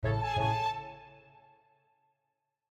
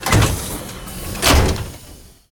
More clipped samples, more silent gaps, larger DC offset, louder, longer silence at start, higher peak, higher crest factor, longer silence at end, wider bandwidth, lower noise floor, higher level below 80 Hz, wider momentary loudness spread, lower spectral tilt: neither; neither; neither; second, -32 LUFS vs -18 LUFS; about the same, 0 s vs 0 s; second, -18 dBFS vs 0 dBFS; about the same, 18 dB vs 18 dB; first, 1.55 s vs 0.25 s; second, 8.8 kHz vs 19 kHz; first, -84 dBFS vs -41 dBFS; second, -52 dBFS vs -24 dBFS; about the same, 18 LU vs 17 LU; first, -6 dB/octave vs -4 dB/octave